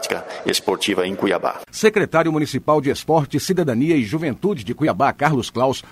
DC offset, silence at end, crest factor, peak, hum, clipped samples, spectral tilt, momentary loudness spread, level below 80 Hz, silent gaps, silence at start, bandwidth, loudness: under 0.1%; 0.1 s; 20 dB; 0 dBFS; none; under 0.1%; -5 dB/octave; 5 LU; -52 dBFS; none; 0 s; 16 kHz; -19 LUFS